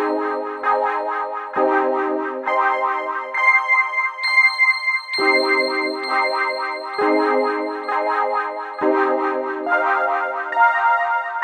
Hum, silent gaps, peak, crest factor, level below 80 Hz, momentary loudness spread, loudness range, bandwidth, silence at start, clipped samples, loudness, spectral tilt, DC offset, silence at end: none; none; -2 dBFS; 16 dB; -78 dBFS; 9 LU; 4 LU; 13.5 kHz; 0 s; under 0.1%; -19 LUFS; -2.5 dB/octave; under 0.1%; 0 s